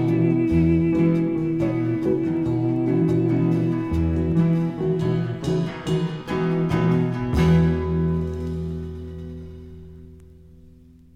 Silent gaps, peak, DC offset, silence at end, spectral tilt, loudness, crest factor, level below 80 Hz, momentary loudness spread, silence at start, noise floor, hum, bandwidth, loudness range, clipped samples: none; -8 dBFS; under 0.1%; 0.8 s; -9 dB/octave; -22 LUFS; 14 dB; -38 dBFS; 14 LU; 0 s; -48 dBFS; 60 Hz at -45 dBFS; 7.8 kHz; 4 LU; under 0.1%